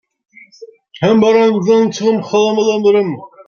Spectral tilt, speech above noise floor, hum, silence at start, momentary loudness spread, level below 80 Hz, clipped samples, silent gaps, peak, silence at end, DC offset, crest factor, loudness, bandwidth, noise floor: -6 dB/octave; 27 dB; none; 0.6 s; 6 LU; -58 dBFS; under 0.1%; none; 0 dBFS; 0.05 s; under 0.1%; 12 dB; -13 LUFS; 7 kHz; -39 dBFS